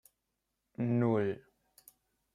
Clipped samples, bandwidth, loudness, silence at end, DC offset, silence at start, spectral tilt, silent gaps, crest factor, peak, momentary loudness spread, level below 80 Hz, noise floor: under 0.1%; 15.5 kHz; -33 LUFS; 0.95 s; under 0.1%; 0.8 s; -9 dB/octave; none; 18 dB; -18 dBFS; 17 LU; -76 dBFS; -85 dBFS